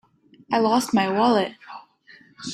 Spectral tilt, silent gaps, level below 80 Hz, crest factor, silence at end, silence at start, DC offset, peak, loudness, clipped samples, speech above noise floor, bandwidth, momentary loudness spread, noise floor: -4.5 dB/octave; none; -64 dBFS; 16 dB; 0 s; 0.5 s; under 0.1%; -6 dBFS; -21 LUFS; under 0.1%; 32 dB; 15 kHz; 22 LU; -52 dBFS